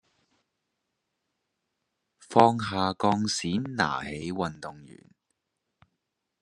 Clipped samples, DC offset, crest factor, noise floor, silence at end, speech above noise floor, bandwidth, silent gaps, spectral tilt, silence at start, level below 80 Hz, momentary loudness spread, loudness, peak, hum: under 0.1%; under 0.1%; 28 dB; -82 dBFS; 1.55 s; 55 dB; 11.5 kHz; none; -5 dB/octave; 2.3 s; -64 dBFS; 13 LU; -26 LUFS; -4 dBFS; none